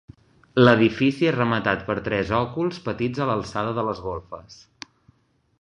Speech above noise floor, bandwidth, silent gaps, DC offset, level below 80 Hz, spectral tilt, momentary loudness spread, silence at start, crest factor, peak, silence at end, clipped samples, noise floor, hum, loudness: 38 dB; 10 kHz; none; under 0.1%; -50 dBFS; -7 dB/octave; 23 LU; 0.55 s; 22 dB; -2 dBFS; 1.05 s; under 0.1%; -60 dBFS; none; -22 LUFS